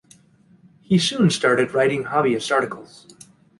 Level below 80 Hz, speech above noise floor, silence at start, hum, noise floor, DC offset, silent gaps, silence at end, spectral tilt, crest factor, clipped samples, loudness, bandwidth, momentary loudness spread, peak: -60 dBFS; 35 dB; 0.9 s; none; -54 dBFS; under 0.1%; none; 0.75 s; -5 dB/octave; 18 dB; under 0.1%; -20 LUFS; 11.5 kHz; 5 LU; -4 dBFS